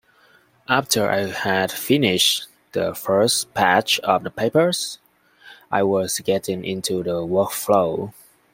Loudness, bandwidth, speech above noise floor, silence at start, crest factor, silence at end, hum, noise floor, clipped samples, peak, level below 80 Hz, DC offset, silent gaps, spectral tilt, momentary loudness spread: -20 LUFS; 16.5 kHz; 36 dB; 0.7 s; 20 dB; 0.4 s; none; -56 dBFS; under 0.1%; -2 dBFS; -60 dBFS; under 0.1%; none; -3.5 dB/octave; 8 LU